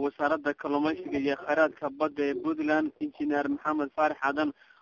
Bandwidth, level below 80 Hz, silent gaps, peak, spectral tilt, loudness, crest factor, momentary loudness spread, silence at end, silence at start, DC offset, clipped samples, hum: 7 kHz; -66 dBFS; none; -12 dBFS; -6 dB/octave; -29 LUFS; 16 dB; 5 LU; 0.3 s; 0 s; under 0.1%; under 0.1%; none